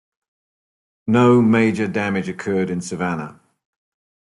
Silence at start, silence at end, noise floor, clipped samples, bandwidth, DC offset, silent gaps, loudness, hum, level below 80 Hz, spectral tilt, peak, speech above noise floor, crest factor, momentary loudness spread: 1.05 s; 0.9 s; under -90 dBFS; under 0.1%; 11.5 kHz; under 0.1%; none; -19 LUFS; none; -60 dBFS; -7 dB/octave; -4 dBFS; over 72 dB; 16 dB; 13 LU